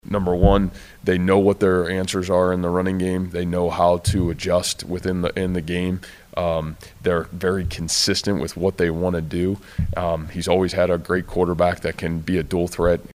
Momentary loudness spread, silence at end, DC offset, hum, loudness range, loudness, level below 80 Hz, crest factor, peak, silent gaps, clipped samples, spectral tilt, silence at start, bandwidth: 8 LU; 0.05 s; under 0.1%; none; 4 LU; -21 LUFS; -34 dBFS; 20 dB; -2 dBFS; none; under 0.1%; -5.5 dB/octave; 0.1 s; 16 kHz